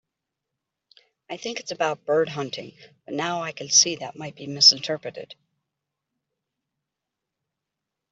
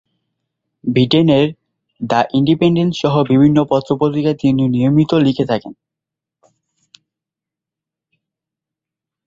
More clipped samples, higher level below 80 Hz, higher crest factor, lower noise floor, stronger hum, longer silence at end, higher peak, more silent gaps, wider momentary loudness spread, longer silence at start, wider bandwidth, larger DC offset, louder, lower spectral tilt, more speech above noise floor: neither; second, -76 dBFS vs -52 dBFS; first, 24 dB vs 16 dB; about the same, -85 dBFS vs -85 dBFS; neither; second, 2.8 s vs 3.55 s; about the same, -2 dBFS vs 0 dBFS; neither; first, 21 LU vs 7 LU; first, 1.3 s vs 0.85 s; about the same, 8.2 kHz vs 7.6 kHz; neither; second, -21 LUFS vs -14 LUFS; second, -1 dB/octave vs -8 dB/octave; second, 60 dB vs 72 dB